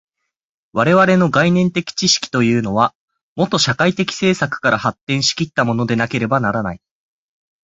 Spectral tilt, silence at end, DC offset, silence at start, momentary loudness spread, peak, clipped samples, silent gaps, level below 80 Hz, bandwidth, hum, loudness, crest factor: -4.5 dB/octave; 0.9 s; under 0.1%; 0.75 s; 7 LU; -2 dBFS; under 0.1%; 2.95-3.08 s, 3.23-3.36 s, 5.01-5.07 s; -50 dBFS; 8 kHz; none; -16 LUFS; 16 dB